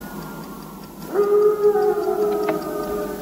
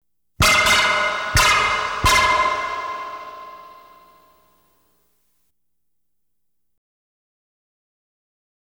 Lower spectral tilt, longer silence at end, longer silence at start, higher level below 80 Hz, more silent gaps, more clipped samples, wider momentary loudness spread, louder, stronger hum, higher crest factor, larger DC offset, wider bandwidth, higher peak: first, -6 dB/octave vs -1.5 dB/octave; second, 0 s vs 5.1 s; second, 0 s vs 0.4 s; second, -50 dBFS vs -38 dBFS; neither; neither; about the same, 19 LU vs 20 LU; second, -20 LUFS vs -17 LUFS; neither; about the same, 14 dB vs 18 dB; neither; second, 16.5 kHz vs over 20 kHz; second, -8 dBFS vs -4 dBFS